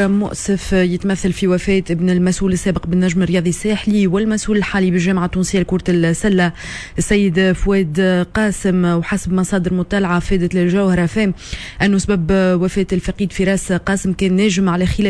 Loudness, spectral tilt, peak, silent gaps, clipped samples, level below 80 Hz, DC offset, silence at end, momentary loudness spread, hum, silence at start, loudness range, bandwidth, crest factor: -16 LUFS; -6 dB/octave; -4 dBFS; none; under 0.1%; -32 dBFS; under 0.1%; 0 s; 4 LU; none; 0 s; 1 LU; 11 kHz; 12 dB